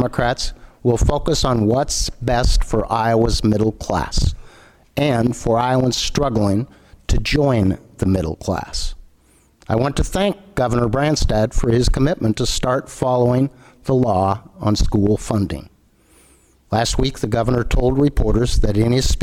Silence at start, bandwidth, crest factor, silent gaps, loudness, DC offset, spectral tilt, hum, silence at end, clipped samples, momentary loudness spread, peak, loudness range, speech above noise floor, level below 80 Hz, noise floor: 0 s; 15 kHz; 14 dB; none; -19 LUFS; under 0.1%; -5.5 dB/octave; none; 0 s; under 0.1%; 7 LU; -4 dBFS; 3 LU; 37 dB; -24 dBFS; -54 dBFS